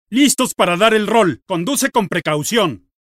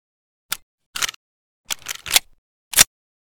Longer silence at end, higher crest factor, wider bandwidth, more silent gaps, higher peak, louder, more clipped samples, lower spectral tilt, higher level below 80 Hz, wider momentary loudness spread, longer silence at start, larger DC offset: second, 0.25 s vs 0.45 s; second, 16 dB vs 24 dB; second, 16 kHz vs over 20 kHz; second, none vs 0.62-0.78 s, 0.86-0.93 s, 1.16-1.64 s, 2.38-2.71 s; about the same, 0 dBFS vs 0 dBFS; first, -16 LUFS vs -20 LUFS; neither; first, -3.5 dB/octave vs 1.5 dB/octave; about the same, -56 dBFS vs -52 dBFS; second, 6 LU vs 15 LU; second, 0.1 s vs 0.5 s; neither